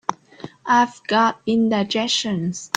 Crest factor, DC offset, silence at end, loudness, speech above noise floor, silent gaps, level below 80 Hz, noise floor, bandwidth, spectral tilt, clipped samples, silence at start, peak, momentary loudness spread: 20 dB; under 0.1%; 0.1 s; -20 LUFS; 21 dB; none; -62 dBFS; -40 dBFS; 9.4 kHz; -4 dB/octave; under 0.1%; 0.1 s; -2 dBFS; 15 LU